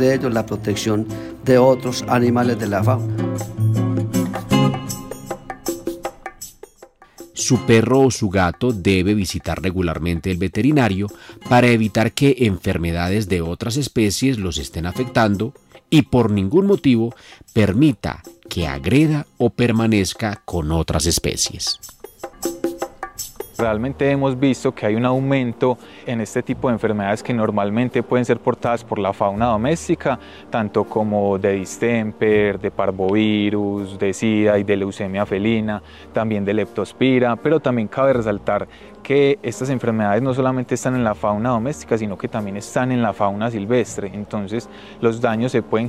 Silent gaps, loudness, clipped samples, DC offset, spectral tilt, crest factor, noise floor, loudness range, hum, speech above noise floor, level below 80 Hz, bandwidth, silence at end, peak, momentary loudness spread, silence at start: none; -19 LUFS; under 0.1%; under 0.1%; -5.5 dB/octave; 16 dB; -47 dBFS; 4 LU; none; 29 dB; -44 dBFS; 16 kHz; 0 s; -2 dBFS; 11 LU; 0 s